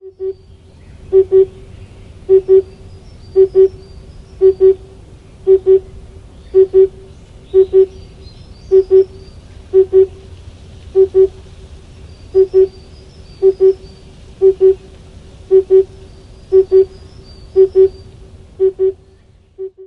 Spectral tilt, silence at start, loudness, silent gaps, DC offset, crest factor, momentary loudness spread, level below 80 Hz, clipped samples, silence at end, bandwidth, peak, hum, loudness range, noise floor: -9 dB/octave; 0.05 s; -13 LUFS; none; under 0.1%; 14 dB; 11 LU; -38 dBFS; under 0.1%; 0.2 s; 5.6 kHz; 0 dBFS; none; 2 LU; -46 dBFS